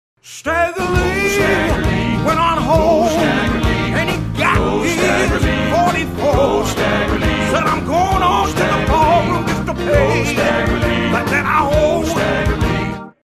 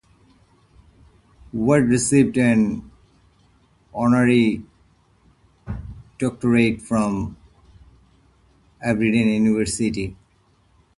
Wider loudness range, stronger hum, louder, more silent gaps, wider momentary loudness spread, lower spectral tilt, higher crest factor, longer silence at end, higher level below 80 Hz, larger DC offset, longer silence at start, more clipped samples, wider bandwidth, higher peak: second, 1 LU vs 5 LU; neither; first, -15 LUFS vs -20 LUFS; neither; second, 4 LU vs 17 LU; about the same, -5.5 dB/octave vs -6 dB/octave; about the same, 14 dB vs 18 dB; second, 0.15 s vs 0.85 s; first, -26 dBFS vs -46 dBFS; neither; second, 0.25 s vs 1.55 s; neither; first, 14 kHz vs 11.5 kHz; first, 0 dBFS vs -4 dBFS